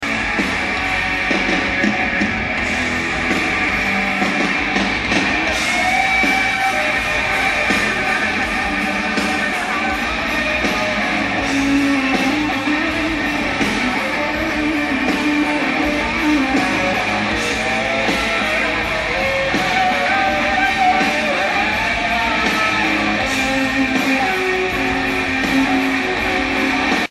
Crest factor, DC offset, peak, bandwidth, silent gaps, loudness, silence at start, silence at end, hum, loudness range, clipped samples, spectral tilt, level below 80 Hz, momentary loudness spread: 14 dB; under 0.1%; -2 dBFS; 14.5 kHz; none; -17 LUFS; 0 s; 0.05 s; none; 2 LU; under 0.1%; -3.5 dB/octave; -38 dBFS; 3 LU